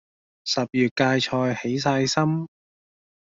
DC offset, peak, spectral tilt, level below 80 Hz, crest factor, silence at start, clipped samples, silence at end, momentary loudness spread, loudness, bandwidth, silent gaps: under 0.1%; -6 dBFS; -5 dB/octave; -62 dBFS; 20 dB; 0.45 s; under 0.1%; 0.8 s; 8 LU; -23 LUFS; 7.8 kHz; 0.91-0.96 s